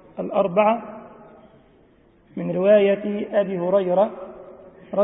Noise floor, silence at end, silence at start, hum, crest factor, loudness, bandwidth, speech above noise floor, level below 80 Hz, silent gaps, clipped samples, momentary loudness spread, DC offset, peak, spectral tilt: -55 dBFS; 0 s; 0.15 s; none; 18 dB; -21 LUFS; 3.9 kHz; 35 dB; -64 dBFS; none; under 0.1%; 22 LU; under 0.1%; -4 dBFS; -11.5 dB/octave